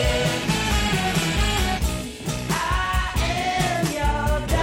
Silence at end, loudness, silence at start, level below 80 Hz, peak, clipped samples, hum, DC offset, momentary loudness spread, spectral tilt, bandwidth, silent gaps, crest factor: 0 s; -23 LUFS; 0 s; -28 dBFS; -8 dBFS; under 0.1%; none; under 0.1%; 4 LU; -4 dB/octave; 17 kHz; none; 14 dB